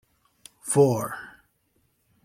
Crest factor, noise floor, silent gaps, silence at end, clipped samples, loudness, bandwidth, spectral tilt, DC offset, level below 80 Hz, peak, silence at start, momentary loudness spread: 20 dB; -69 dBFS; none; 1 s; under 0.1%; -23 LUFS; 16 kHz; -6 dB/octave; under 0.1%; -66 dBFS; -6 dBFS; 0.65 s; 20 LU